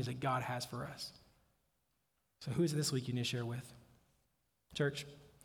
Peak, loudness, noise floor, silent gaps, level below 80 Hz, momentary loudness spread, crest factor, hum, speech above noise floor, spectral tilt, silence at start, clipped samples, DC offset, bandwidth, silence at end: -22 dBFS; -39 LUFS; -82 dBFS; none; -70 dBFS; 14 LU; 18 dB; none; 44 dB; -5 dB/octave; 0 s; under 0.1%; under 0.1%; 19.5 kHz; 0.15 s